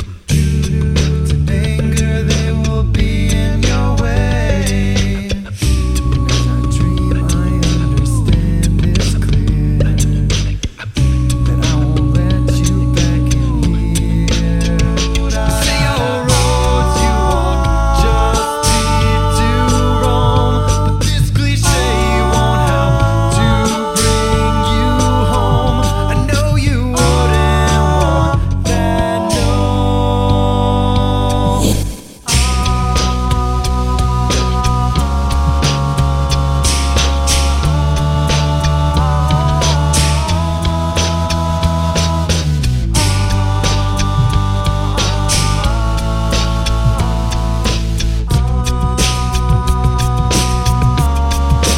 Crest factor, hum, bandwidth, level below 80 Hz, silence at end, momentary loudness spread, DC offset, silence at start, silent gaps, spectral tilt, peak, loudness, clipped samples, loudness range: 12 dB; none; 16 kHz; -16 dBFS; 0 s; 3 LU; under 0.1%; 0 s; none; -5 dB/octave; 0 dBFS; -14 LUFS; under 0.1%; 2 LU